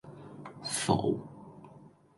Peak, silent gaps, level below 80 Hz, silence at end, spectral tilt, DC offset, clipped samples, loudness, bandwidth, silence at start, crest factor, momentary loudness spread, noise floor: -12 dBFS; none; -62 dBFS; 0.3 s; -4.5 dB/octave; under 0.1%; under 0.1%; -32 LUFS; 12 kHz; 0.05 s; 22 dB; 23 LU; -56 dBFS